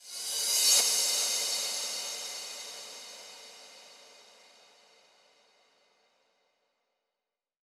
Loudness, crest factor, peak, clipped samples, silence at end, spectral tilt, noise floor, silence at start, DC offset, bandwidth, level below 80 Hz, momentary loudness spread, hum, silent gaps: -27 LUFS; 24 dB; -10 dBFS; under 0.1%; 3.45 s; 3.5 dB/octave; -90 dBFS; 0 s; under 0.1%; over 20 kHz; under -90 dBFS; 25 LU; none; none